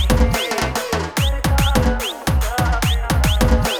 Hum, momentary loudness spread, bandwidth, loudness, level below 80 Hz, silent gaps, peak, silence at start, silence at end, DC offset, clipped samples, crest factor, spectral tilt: none; 4 LU; over 20 kHz; -18 LUFS; -20 dBFS; none; 0 dBFS; 0 s; 0 s; under 0.1%; under 0.1%; 16 dB; -4.5 dB/octave